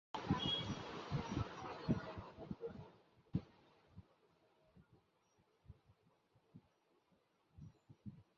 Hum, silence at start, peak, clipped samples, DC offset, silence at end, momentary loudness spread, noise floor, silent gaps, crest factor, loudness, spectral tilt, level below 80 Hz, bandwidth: none; 0.15 s; -24 dBFS; under 0.1%; under 0.1%; 0.15 s; 25 LU; -78 dBFS; none; 24 dB; -44 LUFS; -4.5 dB/octave; -62 dBFS; 7.4 kHz